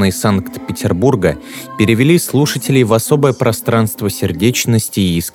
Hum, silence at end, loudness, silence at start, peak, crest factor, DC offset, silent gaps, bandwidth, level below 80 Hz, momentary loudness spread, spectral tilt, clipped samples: none; 0.05 s; -14 LUFS; 0 s; 0 dBFS; 14 dB; under 0.1%; none; 19 kHz; -42 dBFS; 7 LU; -5.5 dB/octave; under 0.1%